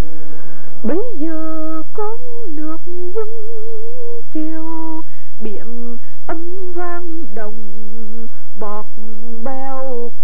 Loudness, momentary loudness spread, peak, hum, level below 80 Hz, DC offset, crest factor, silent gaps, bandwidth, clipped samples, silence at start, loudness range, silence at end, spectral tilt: -28 LUFS; 13 LU; 0 dBFS; none; -50 dBFS; 70%; 16 dB; none; 18 kHz; under 0.1%; 0 s; 5 LU; 0 s; -9 dB/octave